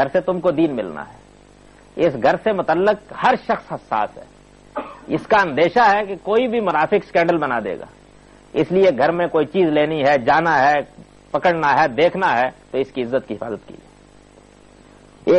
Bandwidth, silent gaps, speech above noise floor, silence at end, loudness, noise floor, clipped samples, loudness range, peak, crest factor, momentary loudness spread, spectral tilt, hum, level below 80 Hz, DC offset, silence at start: 8.8 kHz; none; 29 dB; 0 s; -18 LUFS; -47 dBFS; under 0.1%; 4 LU; -6 dBFS; 14 dB; 14 LU; -6.5 dB/octave; 50 Hz at -50 dBFS; -52 dBFS; under 0.1%; 0 s